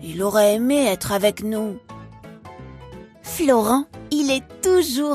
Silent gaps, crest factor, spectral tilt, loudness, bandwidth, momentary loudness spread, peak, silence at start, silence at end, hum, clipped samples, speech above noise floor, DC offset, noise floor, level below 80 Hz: none; 18 dB; -4 dB/octave; -20 LUFS; 15.5 kHz; 23 LU; -4 dBFS; 0 s; 0 s; none; under 0.1%; 21 dB; under 0.1%; -41 dBFS; -50 dBFS